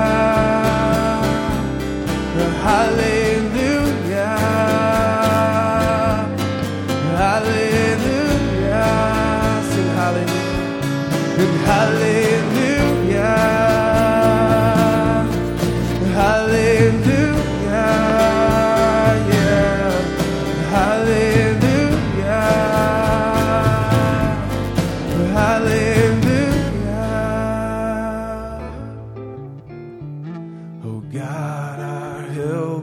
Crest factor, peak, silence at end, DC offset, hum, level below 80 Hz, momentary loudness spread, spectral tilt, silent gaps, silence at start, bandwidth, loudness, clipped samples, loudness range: 16 dB; 0 dBFS; 0 s; under 0.1%; none; -32 dBFS; 12 LU; -6 dB/octave; none; 0 s; 18 kHz; -17 LUFS; under 0.1%; 9 LU